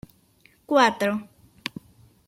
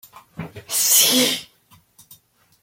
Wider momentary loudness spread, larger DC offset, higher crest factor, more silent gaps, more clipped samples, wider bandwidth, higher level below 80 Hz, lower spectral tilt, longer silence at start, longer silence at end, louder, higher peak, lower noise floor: second, 17 LU vs 23 LU; neither; about the same, 22 dB vs 20 dB; neither; neither; about the same, 16.5 kHz vs 16.5 kHz; about the same, -64 dBFS vs -64 dBFS; first, -4 dB/octave vs -0.5 dB/octave; first, 0.7 s vs 0.4 s; second, 1.05 s vs 1.2 s; second, -22 LUFS vs -16 LUFS; about the same, -4 dBFS vs -2 dBFS; first, -60 dBFS vs -55 dBFS